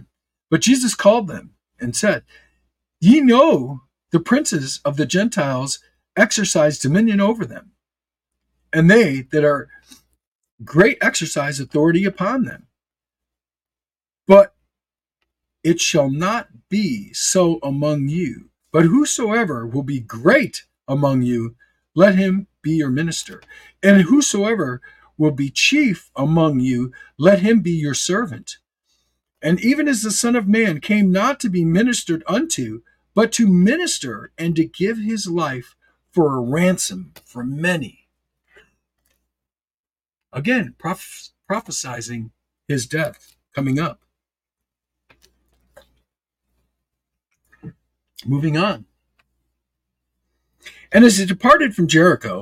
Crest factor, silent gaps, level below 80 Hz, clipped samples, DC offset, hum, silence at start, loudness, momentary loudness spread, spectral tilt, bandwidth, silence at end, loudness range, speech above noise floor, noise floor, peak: 18 dB; 10.27-10.39 s, 10.52-10.58 s, 39.79-39.84 s; -54 dBFS; under 0.1%; under 0.1%; none; 0.5 s; -17 LUFS; 15 LU; -5 dB/octave; 16 kHz; 0 s; 9 LU; over 73 dB; under -90 dBFS; 0 dBFS